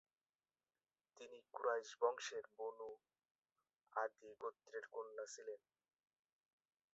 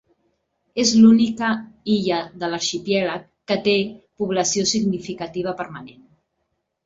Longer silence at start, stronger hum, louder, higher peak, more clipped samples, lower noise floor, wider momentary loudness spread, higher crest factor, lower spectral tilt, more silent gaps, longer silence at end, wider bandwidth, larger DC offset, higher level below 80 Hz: first, 1.15 s vs 0.75 s; neither; second, -47 LUFS vs -20 LUFS; second, -24 dBFS vs -4 dBFS; neither; first, under -90 dBFS vs -74 dBFS; about the same, 17 LU vs 16 LU; first, 26 dB vs 18 dB; second, 1.5 dB/octave vs -4 dB/octave; first, 3.31-3.39 s vs none; first, 1.35 s vs 0.95 s; about the same, 7.6 kHz vs 7.8 kHz; neither; second, under -90 dBFS vs -58 dBFS